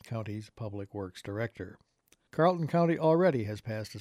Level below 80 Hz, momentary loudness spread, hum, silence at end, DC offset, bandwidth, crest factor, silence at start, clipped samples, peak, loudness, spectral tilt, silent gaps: -68 dBFS; 15 LU; none; 0 s; under 0.1%; 14 kHz; 18 dB; 0.05 s; under 0.1%; -12 dBFS; -31 LUFS; -7.5 dB/octave; none